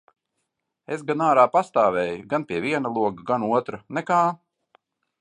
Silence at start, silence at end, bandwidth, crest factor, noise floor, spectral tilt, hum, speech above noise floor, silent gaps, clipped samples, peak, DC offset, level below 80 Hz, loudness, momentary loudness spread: 0.9 s; 0.85 s; 10.5 kHz; 20 dB; -78 dBFS; -6.5 dB/octave; none; 56 dB; none; under 0.1%; -4 dBFS; under 0.1%; -66 dBFS; -23 LUFS; 13 LU